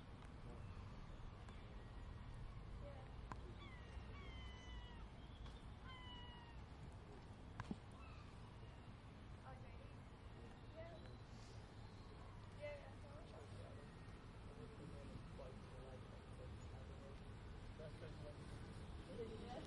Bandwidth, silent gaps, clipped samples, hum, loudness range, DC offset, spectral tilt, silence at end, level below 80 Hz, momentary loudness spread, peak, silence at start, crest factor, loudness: 11 kHz; none; under 0.1%; none; 2 LU; under 0.1%; -6.5 dB/octave; 0 s; -60 dBFS; 5 LU; -34 dBFS; 0 s; 22 dB; -57 LUFS